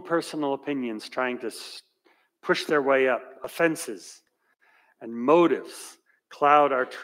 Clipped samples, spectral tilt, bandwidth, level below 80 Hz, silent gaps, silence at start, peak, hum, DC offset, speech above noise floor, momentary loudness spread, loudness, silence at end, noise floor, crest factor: under 0.1%; -4.5 dB/octave; 16 kHz; -80 dBFS; none; 0 s; -6 dBFS; none; under 0.1%; 41 dB; 21 LU; -24 LUFS; 0 s; -66 dBFS; 20 dB